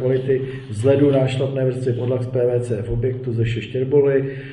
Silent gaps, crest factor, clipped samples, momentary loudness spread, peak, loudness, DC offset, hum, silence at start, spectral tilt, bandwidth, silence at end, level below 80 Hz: none; 16 dB; under 0.1%; 7 LU; -4 dBFS; -20 LUFS; under 0.1%; none; 0 s; -8 dB/octave; 10.5 kHz; 0 s; -42 dBFS